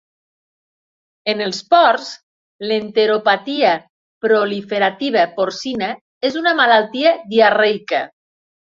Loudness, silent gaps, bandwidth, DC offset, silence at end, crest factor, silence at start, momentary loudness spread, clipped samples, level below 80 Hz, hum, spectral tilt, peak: -16 LUFS; 2.23-2.59 s, 3.90-4.21 s, 6.01-6.21 s; 7.6 kHz; under 0.1%; 0.6 s; 16 dB; 1.25 s; 11 LU; under 0.1%; -66 dBFS; none; -4 dB/octave; 0 dBFS